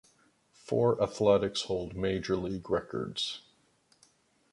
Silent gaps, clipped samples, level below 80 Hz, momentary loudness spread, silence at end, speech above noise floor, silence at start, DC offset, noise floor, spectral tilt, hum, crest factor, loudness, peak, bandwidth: none; under 0.1%; -56 dBFS; 9 LU; 1.1 s; 38 dB; 0.65 s; under 0.1%; -68 dBFS; -5.5 dB/octave; none; 20 dB; -31 LUFS; -12 dBFS; 11.5 kHz